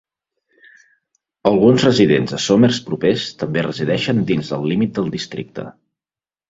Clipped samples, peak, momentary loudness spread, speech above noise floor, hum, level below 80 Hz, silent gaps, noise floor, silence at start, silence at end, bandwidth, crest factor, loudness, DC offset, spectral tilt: under 0.1%; 0 dBFS; 14 LU; over 74 dB; none; -52 dBFS; none; under -90 dBFS; 1.45 s; 0.8 s; 7.8 kHz; 18 dB; -17 LUFS; under 0.1%; -6 dB/octave